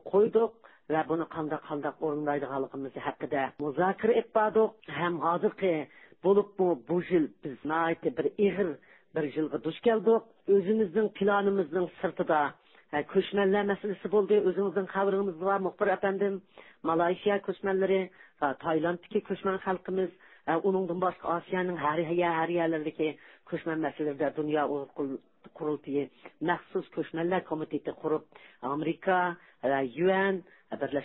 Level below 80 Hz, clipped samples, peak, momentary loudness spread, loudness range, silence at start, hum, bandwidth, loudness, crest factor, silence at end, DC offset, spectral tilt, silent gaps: -70 dBFS; under 0.1%; -14 dBFS; 9 LU; 5 LU; 0.05 s; none; 4.1 kHz; -30 LUFS; 16 dB; 0 s; under 0.1%; -10.5 dB/octave; none